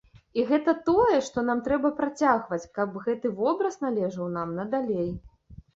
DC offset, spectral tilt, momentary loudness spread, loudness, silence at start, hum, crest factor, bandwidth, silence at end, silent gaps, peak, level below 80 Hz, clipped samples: under 0.1%; -6.5 dB/octave; 9 LU; -26 LUFS; 0.15 s; none; 18 dB; 8 kHz; 0.2 s; none; -8 dBFS; -56 dBFS; under 0.1%